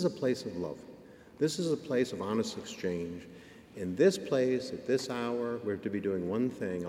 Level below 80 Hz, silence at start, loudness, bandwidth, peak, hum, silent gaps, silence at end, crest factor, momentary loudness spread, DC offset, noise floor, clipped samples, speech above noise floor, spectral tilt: -68 dBFS; 0 s; -33 LUFS; 15.5 kHz; -14 dBFS; none; none; 0 s; 18 dB; 14 LU; under 0.1%; -53 dBFS; under 0.1%; 21 dB; -5.5 dB/octave